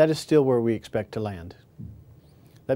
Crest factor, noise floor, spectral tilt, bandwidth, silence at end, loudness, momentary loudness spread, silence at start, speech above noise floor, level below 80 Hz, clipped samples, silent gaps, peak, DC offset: 18 dB; -53 dBFS; -6.5 dB/octave; 16 kHz; 0 s; -24 LUFS; 24 LU; 0 s; 29 dB; -60 dBFS; under 0.1%; none; -6 dBFS; under 0.1%